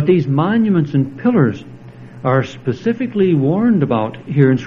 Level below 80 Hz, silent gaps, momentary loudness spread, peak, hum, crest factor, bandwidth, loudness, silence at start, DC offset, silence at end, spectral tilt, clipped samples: -54 dBFS; none; 6 LU; 0 dBFS; none; 14 dB; 7 kHz; -16 LUFS; 0 s; under 0.1%; 0 s; -9 dB/octave; under 0.1%